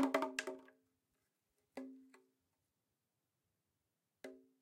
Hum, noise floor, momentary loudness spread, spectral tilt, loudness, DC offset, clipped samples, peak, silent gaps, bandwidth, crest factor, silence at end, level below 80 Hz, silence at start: none; -89 dBFS; 19 LU; -2.5 dB/octave; -44 LUFS; under 0.1%; under 0.1%; -22 dBFS; none; 16 kHz; 26 dB; 0.25 s; under -90 dBFS; 0 s